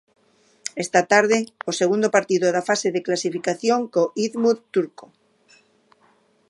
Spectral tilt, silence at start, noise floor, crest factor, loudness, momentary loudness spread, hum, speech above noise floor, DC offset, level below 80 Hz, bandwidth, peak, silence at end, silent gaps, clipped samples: -4 dB/octave; 0.65 s; -60 dBFS; 20 dB; -21 LUFS; 9 LU; none; 40 dB; under 0.1%; -76 dBFS; 11.5 kHz; -2 dBFS; 1.6 s; none; under 0.1%